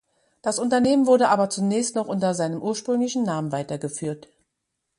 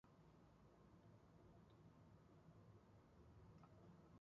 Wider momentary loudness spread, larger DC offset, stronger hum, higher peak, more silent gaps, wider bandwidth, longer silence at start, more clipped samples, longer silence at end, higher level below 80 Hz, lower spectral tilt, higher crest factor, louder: first, 12 LU vs 2 LU; neither; neither; first, -6 dBFS vs -56 dBFS; neither; first, 11.5 kHz vs 7 kHz; first, 0.45 s vs 0.05 s; neither; first, 0.8 s vs 0 s; first, -66 dBFS vs -78 dBFS; second, -5 dB/octave vs -7.5 dB/octave; about the same, 18 dB vs 14 dB; first, -23 LUFS vs -69 LUFS